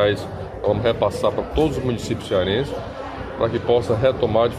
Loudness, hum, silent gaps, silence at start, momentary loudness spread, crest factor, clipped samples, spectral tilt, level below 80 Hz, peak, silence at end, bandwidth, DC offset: -22 LUFS; none; none; 0 s; 11 LU; 16 dB; under 0.1%; -6.5 dB/octave; -38 dBFS; -4 dBFS; 0 s; 13.5 kHz; under 0.1%